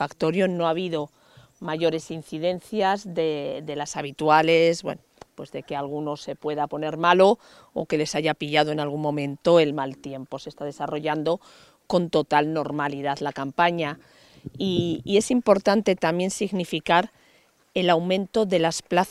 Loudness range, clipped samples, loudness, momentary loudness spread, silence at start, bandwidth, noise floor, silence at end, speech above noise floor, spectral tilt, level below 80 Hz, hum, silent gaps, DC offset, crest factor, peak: 3 LU; under 0.1%; -24 LUFS; 14 LU; 0 s; 13.5 kHz; -60 dBFS; 0 s; 36 dB; -5 dB/octave; -62 dBFS; none; none; under 0.1%; 22 dB; -2 dBFS